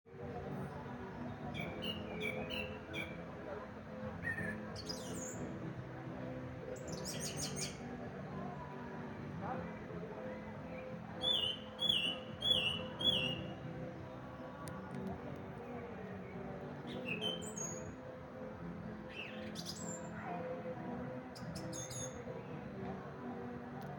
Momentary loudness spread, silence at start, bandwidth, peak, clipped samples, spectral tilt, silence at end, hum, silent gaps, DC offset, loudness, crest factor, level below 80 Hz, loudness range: 13 LU; 0.05 s; 17.5 kHz; -20 dBFS; under 0.1%; -3.5 dB/octave; 0 s; none; none; under 0.1%; -42 LUFS; 22 dB; -64 dBFS; 10 LU